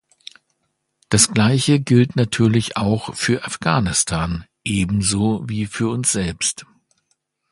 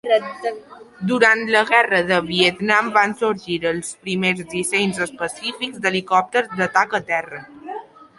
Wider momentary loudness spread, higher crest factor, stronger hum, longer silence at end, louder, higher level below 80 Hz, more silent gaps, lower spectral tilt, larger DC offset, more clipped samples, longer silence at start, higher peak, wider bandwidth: second, 8 LU vs 13 LU; about the same, 20 dB vs 18 dB; neither; first, 0.9 s vs 0.35 s; about the same, -18 LUFS vs -19 LUFS; first, -42 dBFS vs -60 dBFS; neither; about the same, -4.5 dB/octave vs -3.5 dB/octave; neither; neither; first, 1.1 s vs 0.05 s; about the same, 0 dBFS vs -2 dBFS; about the same, 11.5 kHz vs 11.5 kHz